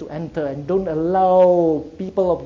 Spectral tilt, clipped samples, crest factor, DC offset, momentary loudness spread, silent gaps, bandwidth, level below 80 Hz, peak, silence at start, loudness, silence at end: -9 dB/octave; under 0.1%; 14 dB; under 0.1%; 12 LU; none; 7 kHz; -46 dBFS; -4 dBFS; 0 s; -18 LUFS; 0 s